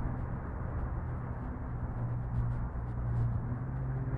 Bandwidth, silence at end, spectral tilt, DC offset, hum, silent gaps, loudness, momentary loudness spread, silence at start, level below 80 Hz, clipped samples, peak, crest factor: 2.7 kHz; 0 s; -11.5 dB/octave; under 0.1%; none; none; -37 LUFS; 5 LU; 0 s; -40 dBFS; under 0.1%; -22 dBFS; 12 dB